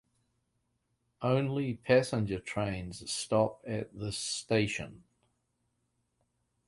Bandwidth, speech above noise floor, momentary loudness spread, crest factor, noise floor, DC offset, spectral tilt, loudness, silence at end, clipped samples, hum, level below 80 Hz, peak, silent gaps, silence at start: 11.5 kHz; 47 dB; 11 LU; 22 dB; -79 dBFS; under 0.1%; -5 dB/octave; -32 LUFS; 1.7 s; under 0.1%; none; -60 dBFS; -12 dBFS; none; 1.2 s